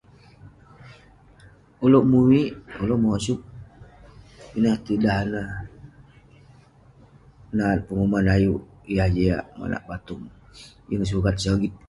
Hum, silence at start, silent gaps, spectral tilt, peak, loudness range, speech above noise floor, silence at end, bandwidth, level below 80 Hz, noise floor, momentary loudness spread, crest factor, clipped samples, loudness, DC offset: none; 0.45 s; none; -7 dB/octave; -6 dBFS; 6 LU; 31 dB; 0.1 s; 11.5 kHz; -40 dBFS; -52 dBFS; 17 LU; 18 dB; under 0.1%; -23 LUFS; under 0.1%